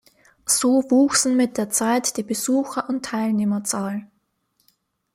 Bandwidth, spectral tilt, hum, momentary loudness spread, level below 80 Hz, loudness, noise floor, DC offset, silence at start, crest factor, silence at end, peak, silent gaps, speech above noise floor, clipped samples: 16 kHz; -3.5 dB/octave; none; 9 LU; -64 dBFS; -21 LUFS; -69 dBFS; under 0.1%; 0.45 s; 18 dB; 1.1 s; -4 dBFS; none; 49 dB; under 0.1%